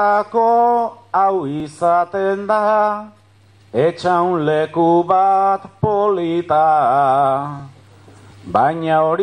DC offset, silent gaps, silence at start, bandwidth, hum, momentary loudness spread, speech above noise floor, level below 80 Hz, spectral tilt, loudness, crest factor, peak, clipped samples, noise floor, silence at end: under 0.1%; none; 0 s; 10.5 kHz; none; 7 LU; 34 dB; -56 dBFS; -7.5 dB/octave; -16 LUFS; 14 dB; -2 dBFS; under 0.1%; -49 dBFS; 0 s